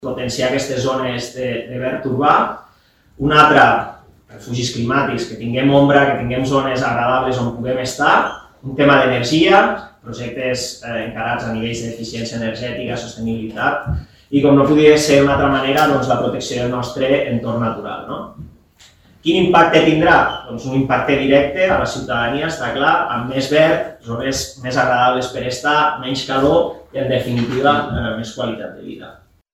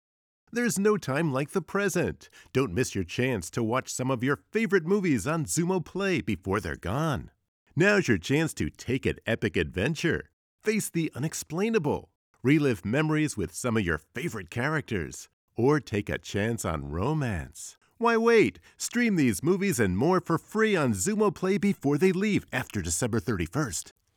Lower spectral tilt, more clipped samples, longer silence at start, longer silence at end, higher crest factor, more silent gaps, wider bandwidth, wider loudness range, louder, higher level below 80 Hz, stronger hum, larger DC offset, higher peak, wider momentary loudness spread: about the same, -5 dB/octave vs -5.5 dB/octave; neither; second, 0 s vs 0.55 s; first, 0.4 s vs 0.25 s; about the same, 16 dB vs 18 dB; second, none vs 7.48-7.66 s, 10.33-10.58 s, 12.15-12.34 s, 15.33-15.48 s; second, 16 kHz vs 19 kHz; about the same, 6 LU vs 4 LU; first, -16 LUFS vs -27 LUFS; first, -42 dBFS vs -52 dBFS; neither; neither; first, 0 dBFS vs -10 dBFS; first, 13 LU vs 9 LU